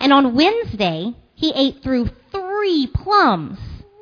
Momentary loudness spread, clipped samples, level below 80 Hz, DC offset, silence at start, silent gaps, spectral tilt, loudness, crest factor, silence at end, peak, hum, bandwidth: 15 LU; under 0.1%; -38 dBFS; under 0.1%; 0 s; none; -6.5 dB/octave; -18 LUFS; 18 dB; 0.25 s; 0 dBFS; none; 5.4 kHz